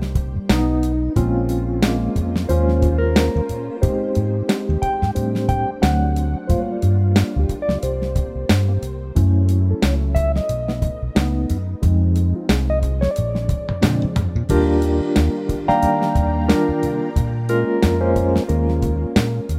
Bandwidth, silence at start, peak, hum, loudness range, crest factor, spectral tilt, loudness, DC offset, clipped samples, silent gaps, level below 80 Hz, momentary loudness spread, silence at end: 15.5 kHz; 0 s; -4 dBFS; none; 1 LU; 14 dB; -7.5 dB/octave; -19 LUFS; under 0.1%; under 0.1%; none; -24 dBFS; 5 LU; 0 s